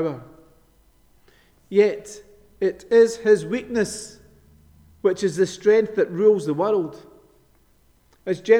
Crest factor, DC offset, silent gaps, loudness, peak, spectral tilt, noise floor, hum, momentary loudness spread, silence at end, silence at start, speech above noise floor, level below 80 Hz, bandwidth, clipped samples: 20 dB; under 0.1%; none; -21 LUFS; -4 dBFS; -5.5 dB/octave; -59 dBFS; none; 17 LU; 0 s; 0 s; 39 dB; -58 dBFS; 12 kHz; under 0.1%